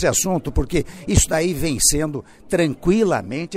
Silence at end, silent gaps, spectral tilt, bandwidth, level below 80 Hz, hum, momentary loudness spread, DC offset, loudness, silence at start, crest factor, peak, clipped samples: 0 s; none; -4 dB/octave; 16 kHz; -30 dBFS; none; 8 LU; under 0.1%; -19 LUFS; 0 s; 16 dB; -4 dBFS; under 0.1%